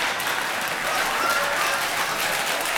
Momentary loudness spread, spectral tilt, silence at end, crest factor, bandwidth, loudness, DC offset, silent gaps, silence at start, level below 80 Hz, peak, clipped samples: 3 LU; -0.5 dB/octave; 0 s; 16 dB; 19.5 kHz; -23 LUFS; under 0.1%; none; 0 s; -54 dBFS; -8 dBFS; under 0.1%